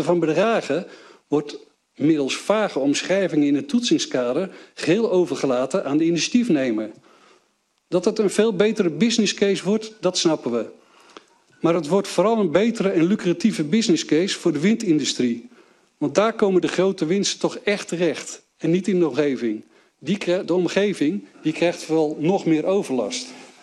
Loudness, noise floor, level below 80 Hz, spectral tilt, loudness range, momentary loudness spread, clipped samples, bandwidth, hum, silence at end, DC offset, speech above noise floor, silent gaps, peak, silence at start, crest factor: -21 LUFS; -67 dBFS; -70 dBFS; -5 dB/octave; 2 LU; 8 LU; under 0.1%; 12 kHz; none; 0.15 s; under 0.1%; 46 dB; none; -4 dBFS; 0 s; 18 dB